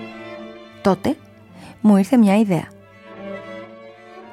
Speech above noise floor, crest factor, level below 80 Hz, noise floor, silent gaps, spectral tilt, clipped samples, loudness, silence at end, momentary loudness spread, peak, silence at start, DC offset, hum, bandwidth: 27 dB; 18 dB; -58 dBFS; -42 dBFS; none; -7.5 dB/octave; under 0.1%; -18 LUFS; 0.1 s; 23 LU; -4 dBFS; 0 s; under 0.1%; none; 13 kHz